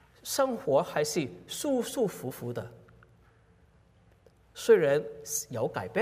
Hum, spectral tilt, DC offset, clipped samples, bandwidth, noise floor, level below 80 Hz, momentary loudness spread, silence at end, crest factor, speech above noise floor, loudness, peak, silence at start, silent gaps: none; -4 dB/octave; under 0.1%; under 0.1%; 16 kHz; -62 dBFS; -66 dBFS; 14 LU; 0 s; 20 dB; 33 dB; -29 LUFS; -10 dBFS; 0.25 s; none